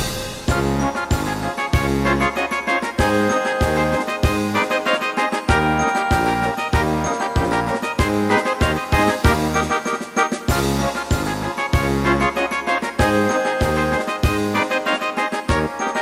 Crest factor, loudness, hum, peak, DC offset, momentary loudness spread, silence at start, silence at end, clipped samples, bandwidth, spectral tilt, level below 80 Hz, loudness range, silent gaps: 18 dB; -19 LUFS; none; -2 dBFS; under 0.1%; 4 LU; 0 s; 0 s; under 0.1%; 16 kHz; -5 dB/octave; -30 dBFS; 1 LU; none